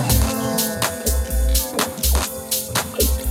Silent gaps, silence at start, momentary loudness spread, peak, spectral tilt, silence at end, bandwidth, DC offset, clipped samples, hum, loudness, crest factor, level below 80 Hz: none; 0 s; 3 LU; -4 dBFS; -3.5 dB/octave; 0 s; 17 kHz; under 0.1%; under 0.1%; none; -20 LUFS; 16 dB; -24 dBFS